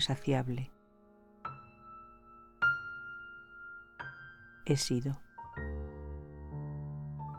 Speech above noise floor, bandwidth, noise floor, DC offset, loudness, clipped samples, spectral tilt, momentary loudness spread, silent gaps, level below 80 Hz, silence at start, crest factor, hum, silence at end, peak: 30 dB; 15 kHz; -63 dBFS; under 0.1%; -37 LUFS; under 0.1%; -5 dB/octave; 21 LU; none; -52 dBFS; 0 s; 20 dB; none; 0 s; -18 dBFS